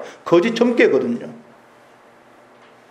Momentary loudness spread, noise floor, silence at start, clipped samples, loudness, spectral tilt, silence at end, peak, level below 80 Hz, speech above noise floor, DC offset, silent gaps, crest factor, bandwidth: 13 LU; -49 dBFS; 0 s; under 0.1%; -17 LUFS; -6 dB/octave; 1.5 s; 0 dBFS; -74 dBFS; 32 dB; under 0.1%; none; 20 dB; 9.8 kHz